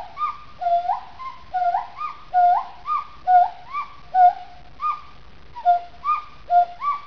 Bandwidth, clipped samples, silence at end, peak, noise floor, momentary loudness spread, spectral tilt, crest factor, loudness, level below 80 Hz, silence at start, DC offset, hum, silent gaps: 5.4 kHz; under 0.1%; 0 s; -6 dBFS; -47 dBFS; 14 LU; -5 dB/octave; 16 dB; -22 LUFS; -54 dBFS; 0 s; 1%; none; none